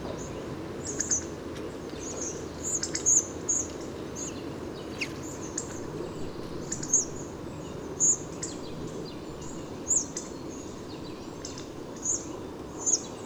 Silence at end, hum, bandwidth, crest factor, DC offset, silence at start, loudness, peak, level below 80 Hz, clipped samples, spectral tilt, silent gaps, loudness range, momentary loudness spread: 0 s; none; over 20 kHz; 22 dB; under 0.1%; 0 s; -31 LUFS; -10 dBFS; -52 dBFS; under 0.1%; -2.5 dB/octave; none; 5 LU; 15 LU